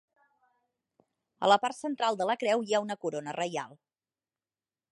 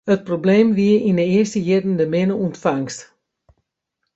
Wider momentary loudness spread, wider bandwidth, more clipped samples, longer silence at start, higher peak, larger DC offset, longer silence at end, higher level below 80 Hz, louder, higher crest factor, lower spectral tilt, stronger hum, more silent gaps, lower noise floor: first, 10 LU vs 7 LU; first, 11.5 kHz vs 8 kHz; neither; first, 1.4 s vs 0.05 s; second, -10 dBFS vs -2 dBFS; neither; about the same, 1.25 s vs 1.15 s; second, -86 dBFS vs -58 dBFS; second, -30 LUFS vs -18 LUFS; first, 24 dB vs 16 dB; second, -3.5 dB/octave vs -7 dB/octave; neither; neither; first, under -90 dBFS vs -77 dBFS